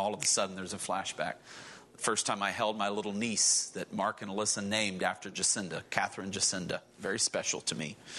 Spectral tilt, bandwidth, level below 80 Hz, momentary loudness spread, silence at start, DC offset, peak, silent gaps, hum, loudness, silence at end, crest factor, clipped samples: -1.5 dB/octave; 12 kHz; -74 dBFS; 10 LU; 0 s; under 0.1%; -10 dBFS; none; none; -31 LUFS; 0 s; 22 dB; under 0.1%